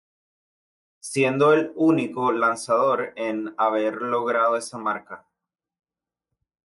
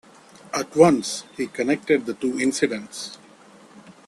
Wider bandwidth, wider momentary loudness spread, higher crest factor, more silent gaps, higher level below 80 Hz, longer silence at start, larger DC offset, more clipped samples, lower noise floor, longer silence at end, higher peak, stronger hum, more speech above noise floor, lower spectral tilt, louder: second, 11.5 kHz vs 13 kHz; second, 10 LU vs 15 LU; second, 16 dB vs 22 dB; neither; second, -74 dBFS vs -64 dBFS; first, 1.05 s vs 0.55 s; neither; neither; first, -86 dBFS vs -49 dBFS; first, 1.45 s vs 0.15 s; second, -8 dBFS vs -2 dBFS; neither; first, 64 dB vs 27 dB; about the same, -5.5 dB/octave vs -4.5 dB/octave; about the same, -22 LUFS vs -22 LUFS